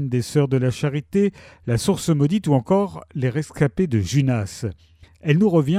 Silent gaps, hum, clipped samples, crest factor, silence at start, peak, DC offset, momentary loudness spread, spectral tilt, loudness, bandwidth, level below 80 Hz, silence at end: none; none; under 0.1%; 16 dB; 0 s; -4 dBFS; under 0.1%; 9 LU; -7 dB/octave; -21 LUFS; 14.5 kHz; -48 dBFS; 0 s